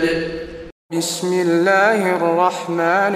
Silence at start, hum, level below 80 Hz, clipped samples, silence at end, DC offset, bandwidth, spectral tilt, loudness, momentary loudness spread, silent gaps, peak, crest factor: 0 s; none; -48 dBFS; under 0.1%; 0 s; under 0.1%; 15.5 kHz; -4.5 dB/octave; -17 LUFS; 14 LU; 0.72-0.89 s; -2 dBFS; 16 dB